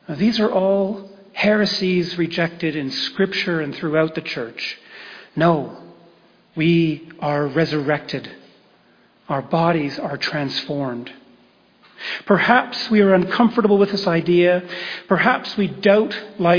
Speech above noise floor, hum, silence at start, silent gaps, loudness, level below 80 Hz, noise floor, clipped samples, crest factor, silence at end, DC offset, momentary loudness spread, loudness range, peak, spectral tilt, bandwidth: 36 dB; none; 0.1 s; none; -19 LUFS; -60 dBFS; -55 dBFS; under 0.1%; 18 dB; 0 s; under 0.1%; 13 LU; 7 LU; -2 dBFS; -6.5 dB/octave; 5.4 kHz